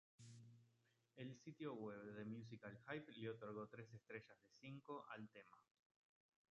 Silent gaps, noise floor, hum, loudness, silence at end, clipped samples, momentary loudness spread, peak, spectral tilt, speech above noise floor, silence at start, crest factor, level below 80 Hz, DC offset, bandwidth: none; -83 dBFS; none; -56 LUFS; 0.85 s; under 0.1%; 13 LU; -36 dBFS; -5.5 dB/octave; 27 dB; 0.2 s; 22 dB; under -90 dBFS; under 0.1%; 7.6 kHz